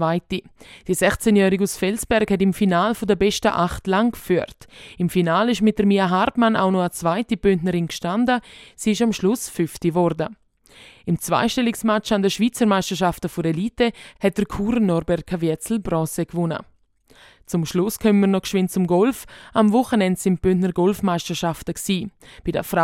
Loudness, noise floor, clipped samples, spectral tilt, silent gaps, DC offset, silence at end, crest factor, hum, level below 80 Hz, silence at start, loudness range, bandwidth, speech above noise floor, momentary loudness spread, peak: -21 LUFS; -55 dBFS; under 0.1%; -5.5 dB/octave; none; under 0.1%; 0 s; 18 dB; none; -46 dBFS; 0 s; 3 LU; 16.5 kHz; 35 dB; 8 LU; -2 dBFS